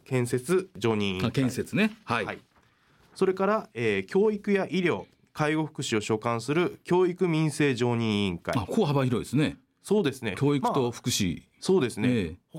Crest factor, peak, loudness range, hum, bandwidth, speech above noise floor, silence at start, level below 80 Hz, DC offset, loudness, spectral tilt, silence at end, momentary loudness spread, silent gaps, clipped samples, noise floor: 14 dB; -14 dBFS; 2 LU; none; 16.5 kHz; 37 dB; 0.1 s; -60 dBFS; under 0.1%; -27 LUFS; -5.5 dB/octave; 0 s; 5 LU; none; under 0.1%; -63 dBFS